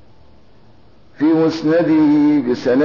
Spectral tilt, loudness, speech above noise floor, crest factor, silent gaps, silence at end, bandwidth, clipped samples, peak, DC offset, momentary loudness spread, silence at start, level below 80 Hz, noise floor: -7.5 dB/octave; -15 LUFS; 36 dB; 10 dB; none; 0 s; 6 kHz; under 0.1%; -6 dBFS; under 0.1%; 4 LU; 1.2 s; -56 dBFS; -49 dBFS